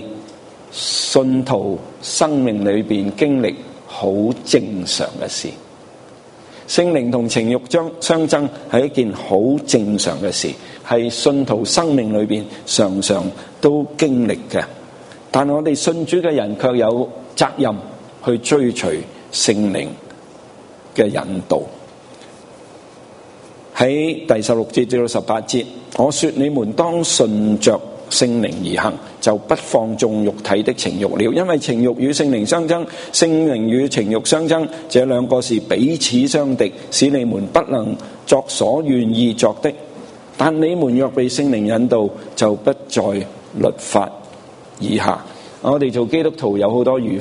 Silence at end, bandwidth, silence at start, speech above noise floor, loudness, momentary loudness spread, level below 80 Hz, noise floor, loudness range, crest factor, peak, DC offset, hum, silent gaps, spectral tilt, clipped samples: 0 s; 11 kHz; 0 s; 24 dB; -17 LUFS; 8 LU; -56 dBFS; -41 dBFS; 4 LU; 18 dB; 0 dBFS; under 0.1%; none; none; -4.5 dB/octave; under 0.1%